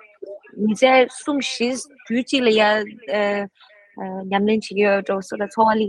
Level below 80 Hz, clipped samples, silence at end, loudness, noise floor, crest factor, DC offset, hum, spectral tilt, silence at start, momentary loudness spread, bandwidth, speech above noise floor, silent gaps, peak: -66 dBFS; under 0.1%; 0 s; -20 LUFS; -38 dBFS; 18 dB; under 0.1%; none; -4.5 dB/octave; 0.2 s; 16 LU; 11.5 kHz; 19 dB; none; -2 dBFS